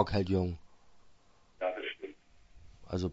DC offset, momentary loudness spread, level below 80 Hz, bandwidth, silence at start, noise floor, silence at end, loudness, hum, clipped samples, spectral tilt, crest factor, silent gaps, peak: under 0.1%; 16 LU; -56 dBFS; 7.6 kHz; 0 s; -63 dBFS; 0 s; -36 LUFS; none; under 0.1%; -6 dB/octave; 24 dB; none; -12 dBFS